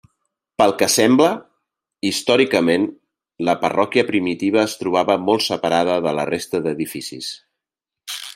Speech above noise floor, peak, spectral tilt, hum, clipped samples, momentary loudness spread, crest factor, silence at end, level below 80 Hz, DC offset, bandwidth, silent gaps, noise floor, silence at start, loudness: 68 dB; -2 dBFS; -4 dB/octave; none; under 0.1%; 15 LU; 18 dB; 0.05 s; -62 dBFS; under 0.1%; 16 kHz; none; -86 dBFS; 0.6 s; -18 LUFS